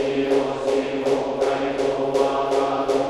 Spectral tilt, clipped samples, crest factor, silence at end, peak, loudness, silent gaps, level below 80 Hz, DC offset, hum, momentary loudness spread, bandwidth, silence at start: -5 dB/octave; under 0.1%; 14 dB; 0 s; -8 dBFS; -22 LUFS; none; -52 dBFS; under 0.1%; none; 2 LU; 12 kHz; 0 s